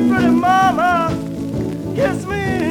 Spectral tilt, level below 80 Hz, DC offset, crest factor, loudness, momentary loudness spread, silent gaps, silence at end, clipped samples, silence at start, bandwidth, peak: -6.5 dB/octave; -42 dBFS; under 0.1%; 12 dB; -17 LUFS; 10 LU; none; 0 s; under 0.1%; 0 s; 17 kHz; -4 dBFS